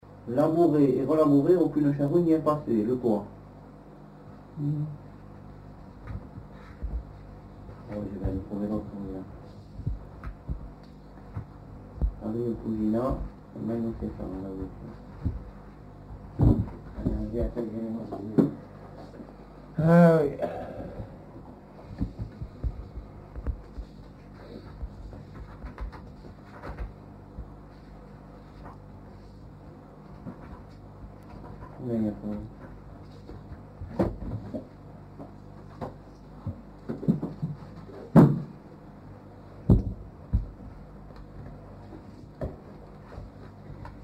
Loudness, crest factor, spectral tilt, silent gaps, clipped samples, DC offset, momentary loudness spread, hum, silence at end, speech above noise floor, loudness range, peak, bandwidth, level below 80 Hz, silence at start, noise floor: -28 LUFS; 26 dB; -10 dB/octave; none; under 0.1%; under 0.1%; 24 LU; 50 Hz at -50 dBFS; 0 s; 22 dB; 18 LU; -4 dBFS; 8.8 kHz; -42 dBFS; 0.05 s; -48 dBFS